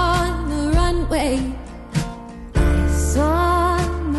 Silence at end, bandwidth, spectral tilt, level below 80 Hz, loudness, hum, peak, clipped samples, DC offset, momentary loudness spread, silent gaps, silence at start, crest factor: 0 s; 12 kHz; -6 dB/octave; -22 dBFS; -20 LUFS; none; -8 dBFS; under 0.1%; under 0.1%; 10 LU; none; 0 s; 12 dB